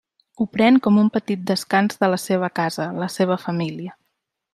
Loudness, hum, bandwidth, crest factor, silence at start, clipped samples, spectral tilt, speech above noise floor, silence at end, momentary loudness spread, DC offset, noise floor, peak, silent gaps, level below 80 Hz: -20 LUFS; none; 14 kHz; 18 dB; 0.4 s; under 0.1%; -6 dB/octave; 56 dB; 0.6 s; 11 LU; under 0.1%; -75 dBFS; -4 dBFS; none; -64 dBFS